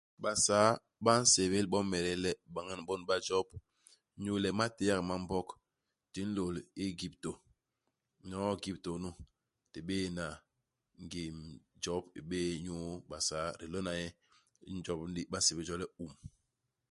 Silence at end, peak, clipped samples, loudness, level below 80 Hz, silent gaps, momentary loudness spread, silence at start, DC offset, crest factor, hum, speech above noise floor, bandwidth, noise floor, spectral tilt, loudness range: 0.65 s; -12 dBFS; under 0.1%; -35 LUFS; -60 dBFS; none; 17 LU; 0.2 s; under 0.1%; 26 dB; none; 52 dB; 11.5 kHz; -88 dBFS; -3.5 dB/octave; 10 LU